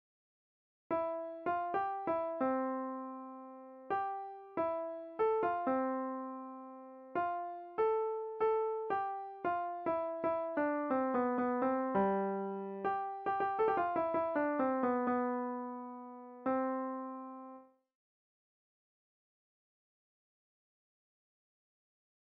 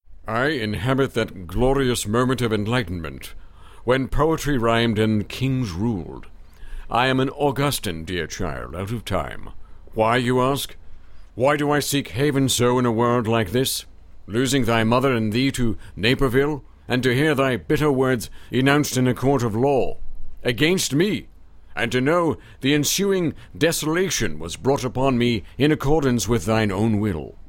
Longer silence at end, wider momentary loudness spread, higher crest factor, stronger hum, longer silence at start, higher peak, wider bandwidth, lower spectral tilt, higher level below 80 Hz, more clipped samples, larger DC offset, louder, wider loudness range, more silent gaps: first, 4.7 s vs 0 s; first, 13 LU vs 9 LU; about the same, 16 dB vs 18 dB; neither; first, 0.9 s vs 0.1 s; second, -20 dBFS vs -2 dBFS; second, 5 kHz vs 17 kHz; about the same, -6 dB/octave vs -5 dB/octave; second, -76 dBFS vs -36 dBFS; neither; neither; second, -36 LUFS vs -21 LUFS; first, 7 LU vs 4 LU; neither